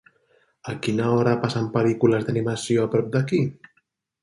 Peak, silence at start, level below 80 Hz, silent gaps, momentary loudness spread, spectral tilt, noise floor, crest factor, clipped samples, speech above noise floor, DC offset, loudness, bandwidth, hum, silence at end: -4 dBFS; 0.65 s; -60 dBFS; none; 9 LU; -7 dB/octave; -69 dBFS; 20 dB; under 0.1%; 48 dB; under 0.1%; -23 LUFS; 11.5 kHz; none; 0.7 s